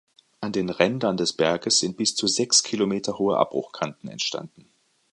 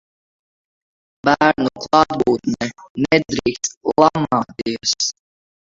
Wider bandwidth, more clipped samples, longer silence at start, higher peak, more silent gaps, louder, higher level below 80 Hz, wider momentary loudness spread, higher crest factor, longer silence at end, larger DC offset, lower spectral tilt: first, 11.5 kHz vs 7.8 kHz; neither; second, 0.4 s vs 1.25 s; about the same, -2 dBFS vs 0 dBFS; second, none vs 2.90-2.95 s, 3.77-3.81 s; second, -23 LUFS vs -18 LUFS; second, -64 dBFS vs -52 dBFS; first, 12 LU vs 8 LU; about the same, 24 dB vs 20 dB; about the same, 0.65 s vs 0.7 s; neither; about the same, -3 dB/octave vs -4 dB/octave